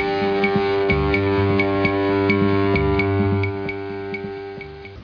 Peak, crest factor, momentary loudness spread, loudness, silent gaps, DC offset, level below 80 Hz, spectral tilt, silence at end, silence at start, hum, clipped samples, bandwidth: -6 dBFS; 14 dB; 12 LU; -20 LUFS; none; under 0.1%; -36 dBFS; -8.5 dB/octave; 0 s; 0 s; none; under 0.1%; 5.4 kHz